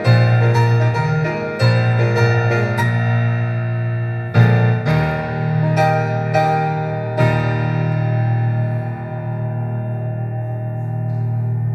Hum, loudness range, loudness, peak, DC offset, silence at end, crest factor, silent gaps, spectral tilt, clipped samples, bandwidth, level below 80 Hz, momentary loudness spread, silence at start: none; 5 LU; -18 LUFS; 0 dBFS; under 0.1%; 0 s; 16 dB; none; -8 dB/octave; under 0.1%; 6.6 kHz; -46 dBFS; 9 LU; 0 s